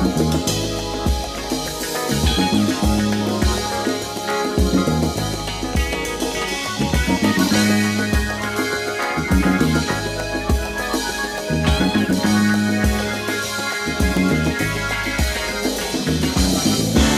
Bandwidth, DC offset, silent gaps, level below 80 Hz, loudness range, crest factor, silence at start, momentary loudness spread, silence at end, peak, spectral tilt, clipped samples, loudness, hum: 16 kHz; under 0.1%; none; -28 dBFS; 2 LU; 16 dB; 0 s; 6 LU; 0 s; -2 dBFS; -4.5 dB/octave; under 0.1%; -20 LUFS; none